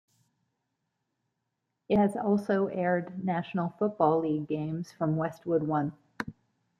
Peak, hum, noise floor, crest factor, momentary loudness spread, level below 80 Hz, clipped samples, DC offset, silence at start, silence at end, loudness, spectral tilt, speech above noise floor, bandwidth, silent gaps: -10 dBFS; none; -82 dBFS; 20 dB; 10 LU; -66 dBFS; under 0.1%; under 0.1%; 1.9 s; 0.5 s; -29 LUFS; -8.5 dB/octave; 54 dB; 10 kHz; none